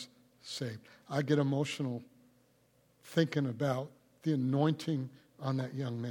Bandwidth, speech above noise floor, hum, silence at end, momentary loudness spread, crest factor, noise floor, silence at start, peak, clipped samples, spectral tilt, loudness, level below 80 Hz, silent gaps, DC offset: 17.5 kHz; 36 dB; none; 0 s; 14 LU; 20 dB; -69 dBFS; 0 s; -16 dBFS; under 0.1%; -6.5 dB/octave; -34 LUFS; -80 dBFS; none; under 0.1%